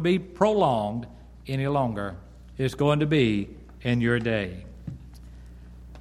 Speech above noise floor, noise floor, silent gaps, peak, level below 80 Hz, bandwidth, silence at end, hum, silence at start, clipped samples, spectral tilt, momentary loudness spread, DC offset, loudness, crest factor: 20 dB; -44 dBFS; none; -6 dBFS; -46 dBFS; 13.5 kHz; 0 s; 60 Hz at -45 dBFS; 0 s; under 0.1%; -7 dB/octave; 22 LU; under 0.1%; -25 LUFS; 20 dB